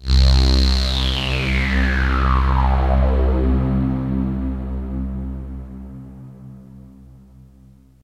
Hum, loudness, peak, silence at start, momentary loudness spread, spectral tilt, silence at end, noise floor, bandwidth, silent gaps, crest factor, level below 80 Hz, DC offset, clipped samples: none; -19 LUFS; -2 dBFS; 0 s; 20 LU; -6 dB/octave; 1.25 s; -48 dBFS; 8.6 kHz; none; 16 dB; -20 dBFS; under 0.1%; under 0.1%